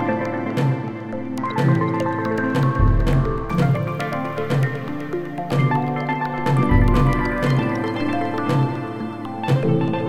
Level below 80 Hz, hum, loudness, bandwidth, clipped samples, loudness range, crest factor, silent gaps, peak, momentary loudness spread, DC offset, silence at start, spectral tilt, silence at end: -28 dBFS; none; -21 LUFS; 12 kHz; under 0.1%; 2 LU; 16 dB; none; -4 dBFS; 9 LU; 0.9%; 0 s; -8 dB/octave; 0 s